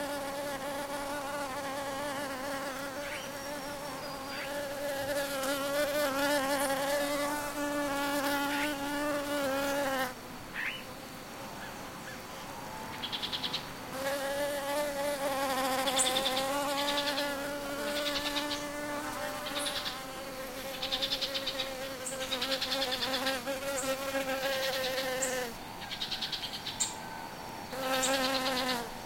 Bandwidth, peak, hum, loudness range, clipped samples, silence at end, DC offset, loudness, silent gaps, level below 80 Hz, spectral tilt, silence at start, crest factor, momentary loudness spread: 16.5 kHz; -14 dBFS; none; 6 LU; under 0.1%; 0 s; under 0.1%; -33 LUFS; none; -58 dBFS; -2 dB/octave; 0 s; 20 dB; 11 LU